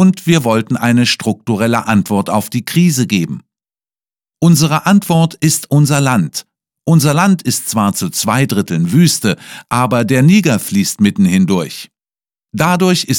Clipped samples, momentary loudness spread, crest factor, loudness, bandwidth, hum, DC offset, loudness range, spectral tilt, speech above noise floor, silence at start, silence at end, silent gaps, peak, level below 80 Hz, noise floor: under 0.1%; 7 LU; 12 dB; -13 LUFS; 18.5 kHz; none; under 0.1%; 2 LU; -5 dB/octave; over 78 dB; 0 s; 0 s; none; 0 dBFS; -52 dBFS; under -90 dBFS